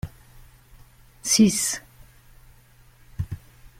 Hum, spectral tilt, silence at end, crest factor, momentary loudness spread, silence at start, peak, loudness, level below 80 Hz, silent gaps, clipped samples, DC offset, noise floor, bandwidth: none; -3.5 dB/octave; 0.15 s; 22 dB; 22 LU; 0.05 s; -6 dBFS; -22 LUFS; -48 dBFS; none; under 0.1%; under 0.1%; -53 dBFS; 16.5 kHz